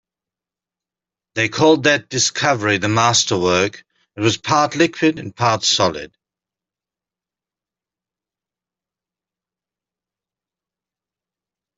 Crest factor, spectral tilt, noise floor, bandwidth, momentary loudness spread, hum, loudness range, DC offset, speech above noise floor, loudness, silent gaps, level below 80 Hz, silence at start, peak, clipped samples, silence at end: 18 dB; -3.5 dB/octave; -89 dBFS; 8.2 kHz; 6 LU; none; 6 LU; under 0.1%; 72 dB; -16 LUFS; none; -58 dBFS; 1.35 s; -2 dBFS; under 0.1%; 5.7 s